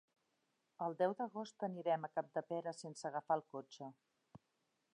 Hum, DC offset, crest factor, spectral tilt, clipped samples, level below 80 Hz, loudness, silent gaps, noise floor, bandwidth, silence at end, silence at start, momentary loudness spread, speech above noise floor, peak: none; under 0.1%; 20 dB; -5.5 dB/octave; under 0.1%; under -90 dBFS; -42 LUFS; none; -84 dBFS; 10.5 kHz; 0.6 s; 0.8 s; 13 LU; 42 dB; -24 dBFS